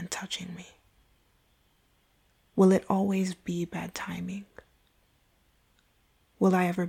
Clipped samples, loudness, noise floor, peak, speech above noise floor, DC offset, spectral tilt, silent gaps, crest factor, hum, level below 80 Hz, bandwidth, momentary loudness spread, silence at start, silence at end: under 0.1%; -28 LUFS; -68 dBFS; -12 dBFS; 41 dB; under 0.1%; -6 dB/octave; none; 20 dB; none; -66 dBFS; 14.5 kHz; 16 LU; 0 s; 0 s